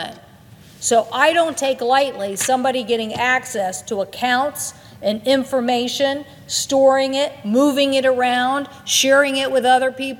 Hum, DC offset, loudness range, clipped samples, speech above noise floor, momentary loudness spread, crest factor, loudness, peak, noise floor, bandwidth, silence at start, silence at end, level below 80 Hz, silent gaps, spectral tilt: none; under 0.1%; 4 LU; under 0.1%; 26 dB; 9 LU; 18 dB; -18 LUFS; 0 dBFS; -44 dBFS; 18 kHz; 0 s; 0 s; -62 dBFS; none; -2 dB/octave